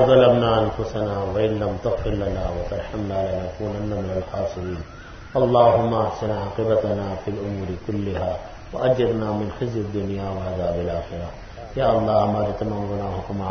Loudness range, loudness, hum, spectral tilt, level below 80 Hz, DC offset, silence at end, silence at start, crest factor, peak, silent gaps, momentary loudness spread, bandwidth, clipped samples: 4 LU; -23 LUFS; none; -8 dB/octave; -40 dBFS; under 0.1%; 0 s; 0 s; 20 dB; -2 dBFS; none; 11 LU; 6.6 kHz; under 0.1%